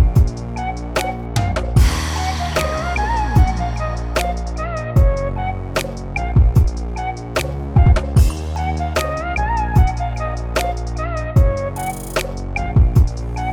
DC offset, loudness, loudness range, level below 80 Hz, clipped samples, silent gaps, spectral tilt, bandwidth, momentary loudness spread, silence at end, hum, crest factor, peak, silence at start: under 0.1%; -19 LUFS; 2 LU; -20 dBFS; under 0.1%; none; -6 dB/octave; 17 kHz; 9 LU; 0 s; none; 14 dB; -2 dBFS; 0 s